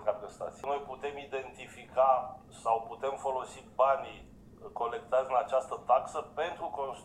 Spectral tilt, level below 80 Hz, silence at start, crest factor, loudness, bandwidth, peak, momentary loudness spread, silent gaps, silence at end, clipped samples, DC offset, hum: -4 dB/octave; -64 dBFS; 0 s; 20 dB; -33 LUFS; 11.5 kHz; -14 dBFS; 15 LU; none; 0 s; under 0.1%; under 0.1%; none